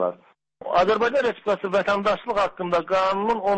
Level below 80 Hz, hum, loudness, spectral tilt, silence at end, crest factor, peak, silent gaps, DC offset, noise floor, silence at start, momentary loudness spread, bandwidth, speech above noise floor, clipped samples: -54 dBFS; none; -22 LUFS; -5.5 dB/octave; 0 s; 12 dB; -10 dBFS; none; under 0.1%; -51 dBFS; 0 s; 5 LU; 8.6 kHz; 30 dB; under 0.1%